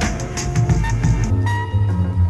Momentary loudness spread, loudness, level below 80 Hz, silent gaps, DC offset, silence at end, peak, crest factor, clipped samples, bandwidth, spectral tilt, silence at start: 4 LU; -19 LUFS; -26 dBFS; none; under 0.1%; 0 s; -4 dBFS; 14 dB; under 0.1%; 12 kHz; -6 dB/octave; 0 s